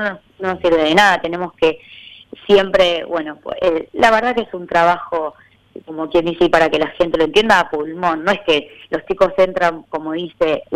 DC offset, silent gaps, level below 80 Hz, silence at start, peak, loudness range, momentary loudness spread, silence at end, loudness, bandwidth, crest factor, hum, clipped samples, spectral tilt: under 0.1%; none; -44 dBFS; 0 s; 0 dBFS; 2 LU; 12 LU; 0 s; -16 LUFS; 15.5 kHz; 16 dB; none; under 0.1%; -4.5 dB/octave